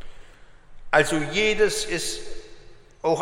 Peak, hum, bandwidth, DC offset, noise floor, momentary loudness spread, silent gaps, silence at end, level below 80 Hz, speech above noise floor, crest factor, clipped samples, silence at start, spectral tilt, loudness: -4 dBFS; none; 16 kHz; under 0.1%; -46 dBFS; 15 LU; none; 0 s; -42 dBFS; 24 dB; 20 dB; under 0.1%; 0 s; -3 dB/octave; -23 LUFS